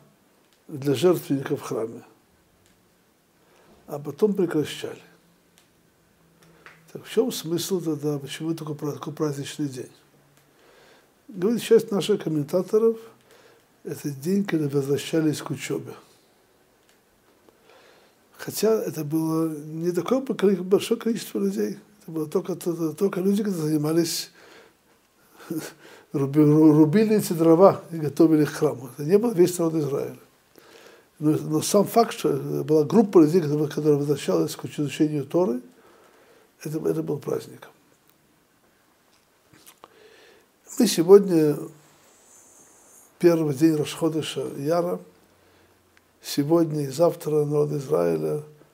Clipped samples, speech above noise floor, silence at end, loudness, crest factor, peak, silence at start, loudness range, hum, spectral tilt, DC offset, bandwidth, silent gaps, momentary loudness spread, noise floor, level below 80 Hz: under 0.1%; 40 dB; 0.25 s; -23 LUFS; 22 dB; -2 dBFS; 0.7 s; 11 LU; none; -6 dB/octave; under 0.1%; 16 kHz; none; 15 LU; -62 dBFS; -74 dBFS